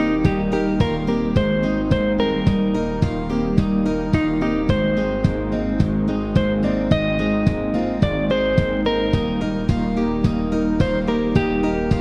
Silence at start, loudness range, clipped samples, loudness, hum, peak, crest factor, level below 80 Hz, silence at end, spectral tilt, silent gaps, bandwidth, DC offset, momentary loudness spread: 0 s; 1 LU; under 0.1%; -20 LUFS; none; -2 dBFS; 18 dB; -30 dBFS; 0 s; -8 dB/octave; none; 9 kHz; under 0.1%; 2 LU